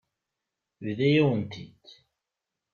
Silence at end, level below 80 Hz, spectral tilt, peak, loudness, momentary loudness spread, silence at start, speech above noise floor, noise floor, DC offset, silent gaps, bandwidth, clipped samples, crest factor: 1.05 s; -68 dBFS; -8 dB/octave; -10 dBFS; -25 LUFS; 21 LU; 0.8 s; 61 dB; -87 dBFS; under 0.1%; none; 7 kHz; under 0.1%; 20 dB